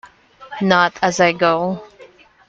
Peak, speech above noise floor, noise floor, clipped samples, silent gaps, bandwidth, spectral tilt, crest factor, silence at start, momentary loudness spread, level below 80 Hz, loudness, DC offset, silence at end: 0 dBFS; 30 dB; -46 dBFS; under 0.1%; none; 8 kHz; -4.5 dB/octave; 18 dB; 0.4 s; 13 LU; -58 dBFS; -16 LUFS; under 0.1%; 0.45 s